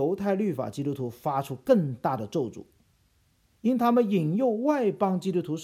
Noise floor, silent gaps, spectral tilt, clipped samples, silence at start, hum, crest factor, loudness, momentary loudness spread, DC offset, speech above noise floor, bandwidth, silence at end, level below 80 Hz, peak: -66 dBFS; none; -8 dB/octave; under 0.1%; 0 s; none; 18 dB; -27 LUFS; 9 LU; under 0.1%; 40 dB; 15.5 kHz; 0 s; -68 dBFS; -8 dBFS